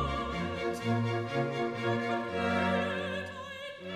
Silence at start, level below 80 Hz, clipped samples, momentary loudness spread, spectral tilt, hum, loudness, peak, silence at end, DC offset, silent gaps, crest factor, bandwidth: 0 s; -50 dBFS; under 0.1%; 9 LU; -6.5 dB/octave; none; -33 LUFS; -18 dBFS; 0 s; under 0.1%; none; 14 dB; 14 kHz